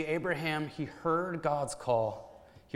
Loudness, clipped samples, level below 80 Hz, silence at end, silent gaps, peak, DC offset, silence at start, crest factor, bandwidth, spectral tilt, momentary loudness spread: -33 LUFS; under 0.1%; -64 dBFS; 0.15 s; none; -16 dBFS; under 0.1%; 0 s; 16 dB; 15.5 kHz; -5.5 dB/octave; 6 LU